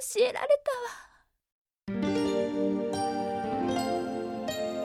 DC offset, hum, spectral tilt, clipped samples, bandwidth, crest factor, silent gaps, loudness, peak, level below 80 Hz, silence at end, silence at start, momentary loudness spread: under 0.1%; none; -4.5 dB/octave; under 0.1%; 16 kHz; 18 dB; 1.52-1.65 s; -30 LUFS; -14 dBFS; -62 dBFS; 0 s; 0 s; 9 LU